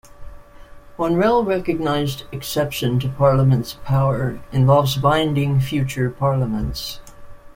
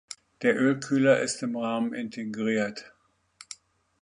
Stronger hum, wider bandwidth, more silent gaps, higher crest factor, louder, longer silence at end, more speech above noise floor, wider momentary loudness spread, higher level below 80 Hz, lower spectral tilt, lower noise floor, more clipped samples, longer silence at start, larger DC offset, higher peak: neither; first, 16.5 kHz vs 11 kHz; neither; about the same, 16 dB vs 20 dB; first, -19 LUFS vs -27 LUFS; second, 0.05 s vs 0.5 s; second, 22 dB vs 29 dB; second, 10 LU vs 21 LU; first, -40 dBFS vs -72 dBFS; first, -6.5 dB/octave vs -5 dB/octave; second, -40 dBFS vs -55 dBFS; neither; about the same, 0.2 s vs 0.1 s; neither; first, -2 dBFS vs -8 dBFS